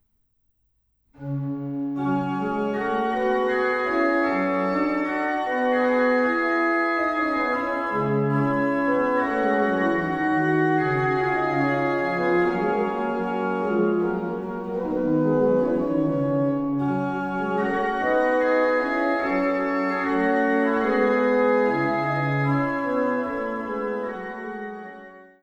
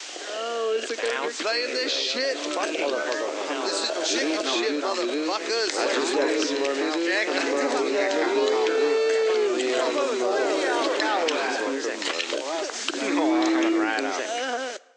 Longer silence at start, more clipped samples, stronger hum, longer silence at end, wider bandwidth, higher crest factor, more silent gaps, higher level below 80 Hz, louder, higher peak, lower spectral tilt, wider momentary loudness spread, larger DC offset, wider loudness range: first, 1.2 s vs 0 s; neither; neither; about the same, 0.2 s vs 0.2 s; second, 8.2 kHz vs 10.5 kHz; about the same, 14 dB vs 18 dB; neither; first, -56 dBFS vs -74 dBFS; about the same, -23 LUFS vs -25 LUFS; about the same, -10 dBFS vs -8 dBFS; first, -8 dB/octave vs -1 dB/octave; about the same, 8 LU vs 6 LU; neither; about the same, 2 LU vs 3 LU